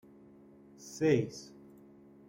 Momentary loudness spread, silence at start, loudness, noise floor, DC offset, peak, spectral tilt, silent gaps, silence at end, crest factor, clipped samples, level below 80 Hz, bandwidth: 24 LU; 0.8 s; -31 LUFS; -57 dBFS; under 0.1%; -16 dBFS; -6.5 dB/octave; none; 0.85 s; 20 dB; under 0.1%; -70 dBFS; 16 kHz